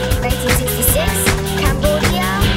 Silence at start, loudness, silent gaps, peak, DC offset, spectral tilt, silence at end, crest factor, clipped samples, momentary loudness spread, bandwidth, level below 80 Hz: 0 s; -15 LUFS; none; 0 dBFS; under 0.1%; -4 dB/octave; 0 s; 14 dB; under 0.1%; 3 LU; 16.5 kHz; -22 dBFS